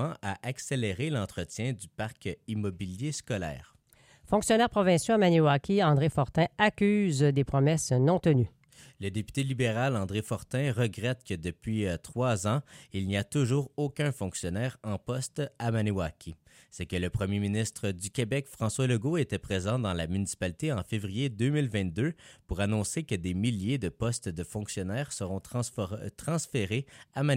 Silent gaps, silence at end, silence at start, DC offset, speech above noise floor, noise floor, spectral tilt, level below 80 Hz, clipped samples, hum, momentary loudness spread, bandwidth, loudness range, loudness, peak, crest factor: none; 0 s; 0 s; under 0.1%; 32 dB; -61 dBFS; -5.5 dB/octave; -54 dBFS; under 0.1%; none; 11 LU; 16 kHz; 8 LU; -30 LUFS; -10 dBFS; 20 dB